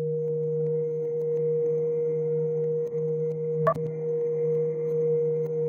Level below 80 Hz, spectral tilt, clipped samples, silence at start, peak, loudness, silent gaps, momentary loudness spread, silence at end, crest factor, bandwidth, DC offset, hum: -70 dBFS; -10.5 dB/octave; under 0.1%; 0 s; -10 dBFS; -27 LUFS; none; 3 LU; 0 s; 16 dB; 2.5 kHz; under 0.1%; none